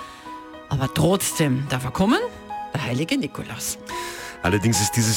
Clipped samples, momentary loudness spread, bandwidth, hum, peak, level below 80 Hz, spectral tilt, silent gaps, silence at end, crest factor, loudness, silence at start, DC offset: under 0.1%; 13 LU; 19 kHz; none; -8 dBFS; -46 dBFS; -4.5 dB/octave; none; 0 s; 14 dB; -23 LUFS; 0 s; under 0.1%